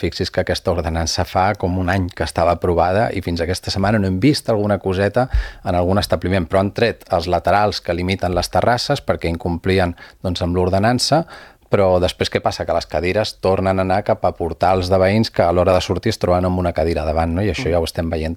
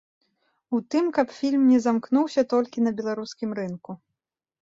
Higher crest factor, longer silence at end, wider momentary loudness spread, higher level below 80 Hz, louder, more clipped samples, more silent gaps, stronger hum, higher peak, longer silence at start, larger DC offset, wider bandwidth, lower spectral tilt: about the same, 18 dB vs 16 dB; second, 0 s vs 0.7 s; second, 6 LU vs 14 LU; first, -36 dBFS vs -70 dBFS; first, -18 LUFS vs -24 LUFS; neither; neither; neither; first, 0 dBFS vs -8 dBFS; second, 0 s vs 0.7 s; neither; first, 15 kHz vs 7.8 kHz; about the same, -5.5 dB/octave vs -6 dB/octave